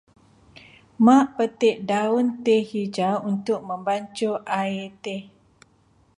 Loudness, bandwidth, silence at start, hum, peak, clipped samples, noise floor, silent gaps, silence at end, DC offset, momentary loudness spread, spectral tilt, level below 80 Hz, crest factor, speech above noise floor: -23 LUFS; 11 kHz; 1 s; none; -4 dBFS; under 0.1%; -60 dBFS; none; 0.95 s; under 0.1%; 13 LU; -6 dB/octave; -68 dBFS; 18 dB; 38 dB